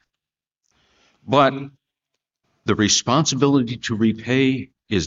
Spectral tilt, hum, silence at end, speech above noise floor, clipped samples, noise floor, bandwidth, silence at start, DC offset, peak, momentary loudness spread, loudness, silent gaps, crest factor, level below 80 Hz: -4.5 dB/octave; none; 0 s; 67 dB; under 0.1%; -86 dBFS; 8 kHz; 1.25 s; under 0.1%; -2 dBFS; 12 LU; -19 LUFS; none; 20 dB; -52 dBFS